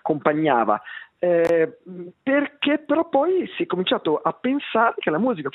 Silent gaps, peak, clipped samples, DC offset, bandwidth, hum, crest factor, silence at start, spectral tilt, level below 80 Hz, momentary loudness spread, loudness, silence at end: none; -4 dBFS; under 0.1%; under 0.1%; 7 kHz; none; 18 dB; 0.05 s; -7 dB/octave; -72 dBFS; 7 LU; -22 LUFS; 0.05 s